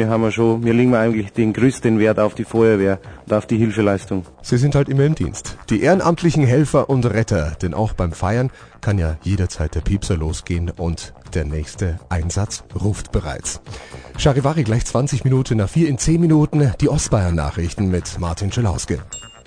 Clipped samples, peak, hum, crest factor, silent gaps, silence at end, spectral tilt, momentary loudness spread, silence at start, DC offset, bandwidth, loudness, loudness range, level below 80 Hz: under 0.1%; -2 dBFS; none; 16 dB; none; 0.15 s; -6.5 dB/octave; 10 LU; 0 s; under 0.1%; 10 kHz; -19 LUFS; 6 LU; -32 dBFS